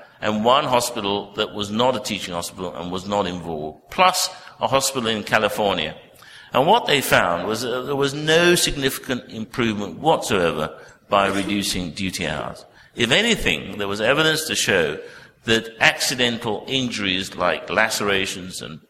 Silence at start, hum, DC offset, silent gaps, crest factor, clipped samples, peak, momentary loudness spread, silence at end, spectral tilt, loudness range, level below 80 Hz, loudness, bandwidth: 0 s; none; under 0.1%; none; 22 dB; under 0.1%; 0 dBFS; 12 LU; 0.1 s; -3 dB/octave; 3 LU; -46 dBFS; -20 LUFS; 16 kHz